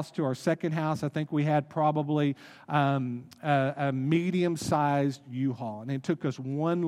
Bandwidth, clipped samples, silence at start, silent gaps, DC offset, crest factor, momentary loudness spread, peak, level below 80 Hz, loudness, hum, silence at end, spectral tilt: 13.5 kHz; under 0.1%; 0 s; none; under 0.1%; 18 dB; 6 LU; -10 dBFS; -70 dBFS; -29 LUFS; none; 0 s; -7 dB/octave